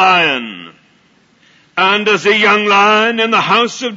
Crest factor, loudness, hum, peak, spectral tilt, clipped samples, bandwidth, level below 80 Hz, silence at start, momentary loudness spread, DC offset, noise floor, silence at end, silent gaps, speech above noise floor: 14 dB; -11 LUFS; none; 0 dBFS; -3.5 dB/octave; under 0.1%; 7.8 kHz; -66 dBFS; 0 s; 12 LU; under 0.1%; -52 dBFS; 0 s; none; 40 dB